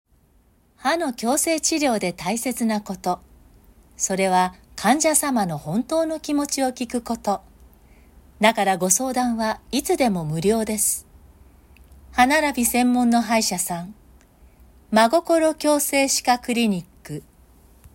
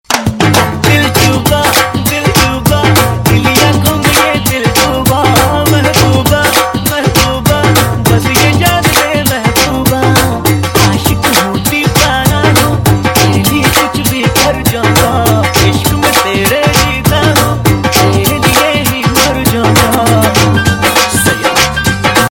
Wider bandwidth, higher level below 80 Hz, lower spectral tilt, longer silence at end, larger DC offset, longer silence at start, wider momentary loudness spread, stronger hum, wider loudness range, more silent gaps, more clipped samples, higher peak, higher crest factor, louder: about the same, 16.5 kHz vs 17.5 kHz; second, -52 dBFS vs -26 dBFS; about the same, -3.5 dB/octave vs -4 dB/octave; first, 0.75 s vs 0.05 s; neither; first, 0.8 s vs 0.1 s; first, 9 LU vs 2 LU; neither; about the same, 3 LU vs 1 LU; neither; second, under 0.1% vs 0.6%; second, -4 dBFS vs 0 dBFS; first, 20 dB vs 8 dB; second, -21 LUFS vs -8 LUFS